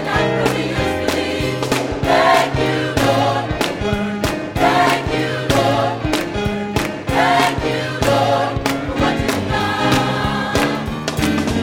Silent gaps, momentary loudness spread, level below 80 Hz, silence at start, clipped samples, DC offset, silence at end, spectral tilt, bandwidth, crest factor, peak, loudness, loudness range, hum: none; 6 LU; -34 dBFS; 0 s; under 0.1%; under 0.1%; 0 s; -5 dB/octave; 19 kHz; 16 dB; 0 dBFS; -17 LUFS; 1 LU; none